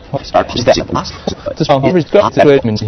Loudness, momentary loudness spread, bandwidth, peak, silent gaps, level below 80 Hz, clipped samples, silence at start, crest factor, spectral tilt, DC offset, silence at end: -12 LUFS; 12 LU; 6.8 kHz; 0 dBFS; none; -36 dBFS; 0.5%; 0.05 s; 12 dB; -6 dB/octave; under 0.1%; 0 s